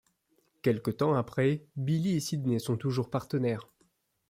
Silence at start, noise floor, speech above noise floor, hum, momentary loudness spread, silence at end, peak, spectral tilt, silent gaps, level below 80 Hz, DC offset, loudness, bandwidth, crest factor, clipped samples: 0.65 s; -72 dBFS; 43 dB; none; 4 LU; 0.65 s; -14 dBFS; -7 dB/octave; none; -66 dBFS; under 0.1%; -31 LUFS; 16 kHz; 18 dB; under 0.1%